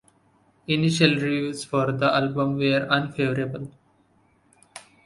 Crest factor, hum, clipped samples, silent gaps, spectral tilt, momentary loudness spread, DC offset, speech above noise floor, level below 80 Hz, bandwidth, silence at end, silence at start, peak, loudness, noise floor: 22 dB; none; under 0.1%; none; -5.5 dB/octave; 19 LU; under 0.1%; 39 dB; -60 dBFS; 11.5 kHz; 0.25 s; 0.7 s; -2 dBFS; -23 LUFS; -62 dBFS